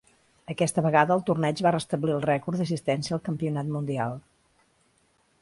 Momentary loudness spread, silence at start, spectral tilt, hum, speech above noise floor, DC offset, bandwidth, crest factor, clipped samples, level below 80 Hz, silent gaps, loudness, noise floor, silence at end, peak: 8 LU; 0.5 s; -6 dB/octave; none; 41 dB; under 0.1%; 11.5 kHz; 22 dB; under 0.1%; -64 dBFS; none; -26 LUFS; -67 dBFS; 1.2 s; -6 dBFS